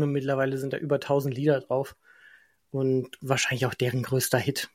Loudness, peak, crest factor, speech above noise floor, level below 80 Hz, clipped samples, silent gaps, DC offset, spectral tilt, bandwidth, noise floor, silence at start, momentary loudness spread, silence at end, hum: -27 LUFS; -8 dBFS; 20 dB; 31 dB; -66 dBFS; under 0.1%; none; under 0.1%; -5 dB/octave; 16.5 kHz; -57 dBFS; 0 s; 5 LU; 0.1 s; none